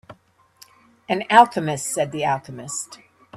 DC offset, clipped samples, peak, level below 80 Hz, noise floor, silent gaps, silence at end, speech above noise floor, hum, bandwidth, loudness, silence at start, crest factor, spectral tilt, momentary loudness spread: under 0.1%; under 0.1%; 0 dBFS; -64 dBFS; -56 dBFS; none; 0 s; 35 dB; none; 14.5 kHz; -20 LUFS; 0.1 s; 22 dB; -3.5 dB/octave; 15 LU